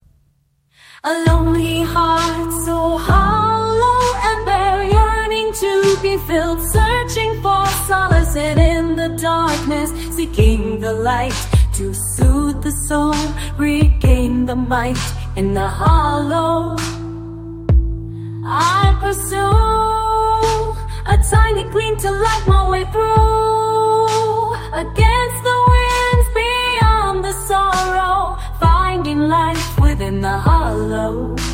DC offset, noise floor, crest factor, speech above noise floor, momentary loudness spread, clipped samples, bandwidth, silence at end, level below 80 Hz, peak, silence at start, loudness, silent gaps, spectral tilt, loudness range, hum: under 0.1%; -60 dBFS; 14 dB; 45 dB; 7 LU; under 0.1%; 16.5 kHz; 0 s; -20 dBFS; 0 dBFS; 1.05 s; -16 LUFS; none; -5.5 dB/octave; 3 LU; none